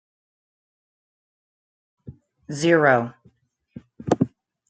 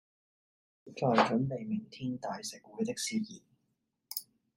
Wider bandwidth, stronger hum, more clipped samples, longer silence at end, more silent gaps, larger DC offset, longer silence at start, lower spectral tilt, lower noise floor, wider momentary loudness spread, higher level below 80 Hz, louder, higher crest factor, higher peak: second, 9 kHz vs 16 kHz; neither; neither; about the same, 0.45 s vs 0.35 s; neither; neither; first, 2.05 s vs 0.85 s; about the same, -6 dB/octave vs -5 dB/octave; second, -60 dBFS vs -81 dBFS; first, 18 LU vs 15 LU; first, -62 dBFS vs -74 dBFS; first, -21 LUFS vs -34 LUFS; about the same, 22 dB vs 24 dB; first, -4 dBFS vs -12 dBFS